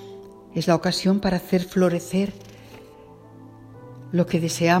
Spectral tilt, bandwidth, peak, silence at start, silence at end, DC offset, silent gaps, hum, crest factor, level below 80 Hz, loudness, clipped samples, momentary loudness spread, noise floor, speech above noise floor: -5.5 dB/octave; 16 kHz; -4 dBFS; 0 s; 0 s; under 0.1%; none; none; 20 dB; -52 dBFS; -23 LUFS; under 0.1%; 23 LU; -46 dBFS; 25 dB